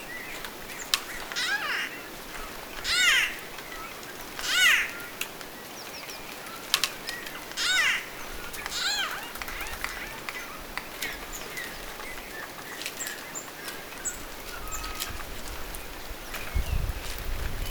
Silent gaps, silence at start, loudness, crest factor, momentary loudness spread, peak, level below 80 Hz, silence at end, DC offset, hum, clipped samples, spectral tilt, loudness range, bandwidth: none; 0 s; -30 LUFS; 30 dB; 15 LU; -2 dBFS; -42 dBFS; 0 s; under 0.1%; none; under 0.1%; -1 dB/octave; 10 LU; over 20 kHz